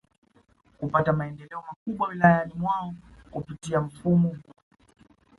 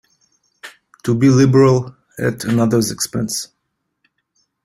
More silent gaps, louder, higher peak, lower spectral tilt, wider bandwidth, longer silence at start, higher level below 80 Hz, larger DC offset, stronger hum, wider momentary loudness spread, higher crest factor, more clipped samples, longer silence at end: first, 1.76-1.86 s vs none; second, -26 LUFS vs -16 LUFS; about the same, -4 dBFS vs -2 dBFS; first, -8 dB/octave vs -6 dB/octave; second, 11.5 kHz vs 16 kHz; first, 0.8 s vs 0.65 s; about the same, -56 dBFS vs -52 dBFS; neither; neither; first, 19 LU vs 14 LU; first, 24 dB vs 16 dB; neither; second, 0.95 s vs 1.2 s